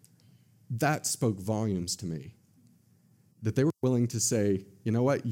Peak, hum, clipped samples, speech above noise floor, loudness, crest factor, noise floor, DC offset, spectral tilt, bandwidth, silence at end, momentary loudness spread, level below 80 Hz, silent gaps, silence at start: -14 dBFS; none; under 0.1%; 35 dB; -29 LUFS; 18 dB; -63 dBFS; under 0.1%; -5 dB/octave; 17 kHz; 0 s; 10 LU; -66 dBFS; none; 0.7 s